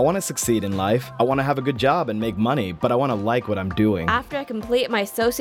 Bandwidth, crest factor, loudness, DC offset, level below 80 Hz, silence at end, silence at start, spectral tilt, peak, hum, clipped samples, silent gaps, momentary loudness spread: 18 kHz; 16 dB; -22 LUFS; under 0.1%; -46 dBFS; 0 s; 0 s; -5 dB/octave; -4 dBFS; none; under 0.1%; none; 3 LU